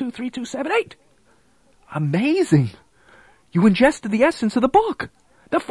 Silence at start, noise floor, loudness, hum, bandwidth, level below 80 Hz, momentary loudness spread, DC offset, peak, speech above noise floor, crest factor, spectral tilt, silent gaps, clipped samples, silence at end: 0 s; -59 dBFS; -20 LUFS; none; 12 kHz; -52 dBFS; 12 LU; under 0.1%; -4 dBFS; 40 dB; 18 dB; -6.5 dB/octave; none; under 0.1%; 0.05 s